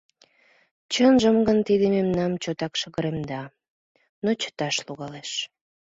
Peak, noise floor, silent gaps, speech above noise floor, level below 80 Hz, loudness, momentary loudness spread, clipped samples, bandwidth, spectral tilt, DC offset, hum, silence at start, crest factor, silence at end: -6 dBFS; -61 dBFS; 3.69-3.95 s, 4.09-4.22 s; 38 dB; -56 dBFS; -24 LUFS; 16 LU; under 0.1%; 8 kHz; -5 dB/octave; under 0.1%; none; 0.9 s; 18 dB; 0.5 s